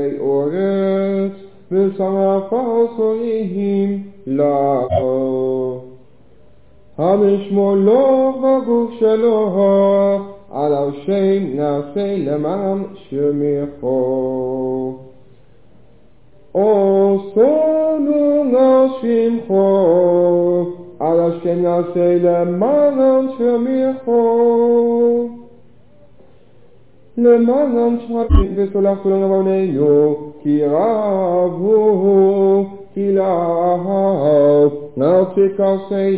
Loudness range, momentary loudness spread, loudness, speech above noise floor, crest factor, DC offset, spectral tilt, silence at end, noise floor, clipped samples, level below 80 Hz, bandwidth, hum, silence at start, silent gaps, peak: 5 LU; 8 LU; -16 LUFS; 36 dB; 16 dB; 0.6%; -12.5 dB/octave; 0 s; -50 dBFS; under 0.1%; -34 dBFS; 4 kHz; none; 0 s; none; 0 dBFS